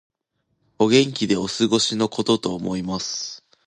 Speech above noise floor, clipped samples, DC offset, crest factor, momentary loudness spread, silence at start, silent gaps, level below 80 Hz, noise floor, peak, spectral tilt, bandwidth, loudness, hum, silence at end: 53 dB; under 0.1%; under 0.1%; 20 dB; 9 LU; 0.8 s; none; -56 dBFS; -73 dBFS; -2 dBFS; -4 dB/octave; 11.5 kHz; -21 LUFS; none; 0.3 s